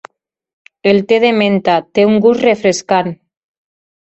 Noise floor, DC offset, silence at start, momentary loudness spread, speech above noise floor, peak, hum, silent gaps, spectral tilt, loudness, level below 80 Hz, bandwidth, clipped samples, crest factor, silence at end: -41 dBFS; under 0.1%; 0.85 s; 5 LU; 29 dB; 0 dBFS; none; none; -5 dB/octave; -12 LUFS; -56 dBFS; 8.2 kHz; under 0.1%; 14 dB; 0.9 s